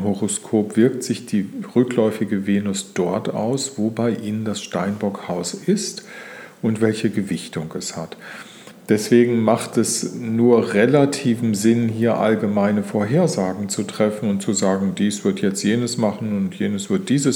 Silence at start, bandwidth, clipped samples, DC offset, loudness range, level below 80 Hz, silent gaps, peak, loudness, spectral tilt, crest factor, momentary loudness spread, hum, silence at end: 0 s; 17 kHz; under 0.1%; under 0.1%; 6 LU; -66 dBFS; none; -2 dBFS; -20 LUFS; -5.5 dB/octave; 18 dB; 10 LU; none; 0 s